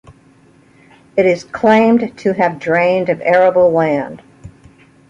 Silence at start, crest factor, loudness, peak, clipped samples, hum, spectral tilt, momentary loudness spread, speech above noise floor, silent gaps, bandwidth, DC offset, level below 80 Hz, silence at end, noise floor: 1.15 s; 14 dB; -14 LUFS; 0 dBFS; under 0.1%; none; -7 dB/octave; 8 LU; 35 dB; none; 7.8 kHz; under 0.1%; -52 dBFS; 0.6 s; -48 dBFS